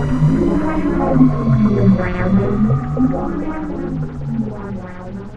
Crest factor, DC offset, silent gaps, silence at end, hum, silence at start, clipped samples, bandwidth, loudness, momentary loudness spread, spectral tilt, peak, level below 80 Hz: 16 dB; under 0.1%; none; 0 s; none; 0 s; under 0.1%; 8.2 kHz; -17 LUFS; 12 LU; -10 dB/octave; 0 dBFS; -28 dBFS